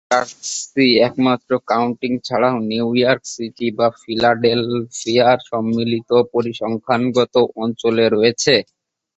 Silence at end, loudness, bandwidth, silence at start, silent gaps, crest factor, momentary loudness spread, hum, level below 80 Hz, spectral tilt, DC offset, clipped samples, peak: 0.55 s; -17 LUFS; 8.2 kHz; 0.1 s; none; 16 dB; 8 LU; none; -58 dBFS; -4.5 dB/octave; under 0.1%; under 0.1%; -2 dBFS